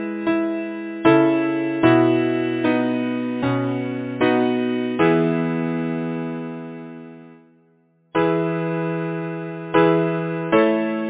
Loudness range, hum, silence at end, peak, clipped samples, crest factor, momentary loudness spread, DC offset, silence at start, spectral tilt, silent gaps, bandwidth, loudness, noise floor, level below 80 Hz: 7 LU; none; 0 s; 0 dBFS; under 0.1%; 20 dB; 12 LU; under 0.1%; 0 s; -11 dB/octave; none; 4 kHz; -20 LUFS; -59 dBFS; -58 dBFS